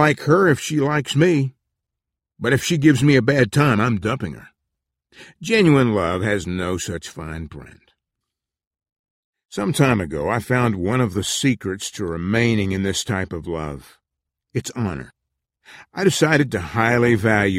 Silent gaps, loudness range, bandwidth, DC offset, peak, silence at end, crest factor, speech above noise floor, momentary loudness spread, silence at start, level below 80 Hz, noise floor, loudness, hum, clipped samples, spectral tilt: 8.67-8.71 s, 8.99-9.04 s, 9.10-9.33 s; 8 LU; 16 kHz; under 0.1%; -2 dBFS; 0 s; 18 dB; 65 dB; 15 LU; 0 s; -46 dBFS; -84 dBFS; -19 LUFS; none; under 0.1%; -5.5 dB/octave